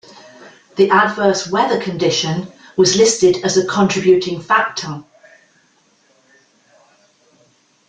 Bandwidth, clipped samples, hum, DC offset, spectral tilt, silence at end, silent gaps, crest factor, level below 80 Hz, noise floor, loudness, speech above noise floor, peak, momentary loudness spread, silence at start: 9.4 kHz; under 0.1%; none; under 0.1%; -4 dB/octave; 2.85 s; none; 18 dB; -56 dBFS; -57 dBFS; -15 LUFS; 42 dB; 0 dBFS; 13 LU; 0.4 s